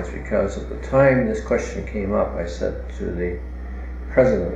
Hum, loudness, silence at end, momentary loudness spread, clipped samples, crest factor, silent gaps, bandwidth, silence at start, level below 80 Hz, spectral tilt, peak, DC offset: none; -22 LUFS; 0 s; 15 LU; under 0.1%; 20 dB; none; 8.2 kHz; 0 s; -32 dBFS; -7.5 dB/octave; -2 dBFS; under 0.1%